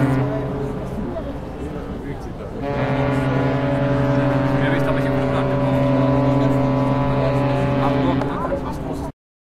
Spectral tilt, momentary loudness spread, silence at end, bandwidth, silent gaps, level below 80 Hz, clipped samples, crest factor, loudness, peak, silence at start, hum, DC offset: -8.5 dB/octave; 12 LU; 0.35 s; 9.8 kHz; none; -36 dBFS; under 0.1%; 14 dB; -20 LUFS; -6 dBFS; 0 s; none; under 0.1%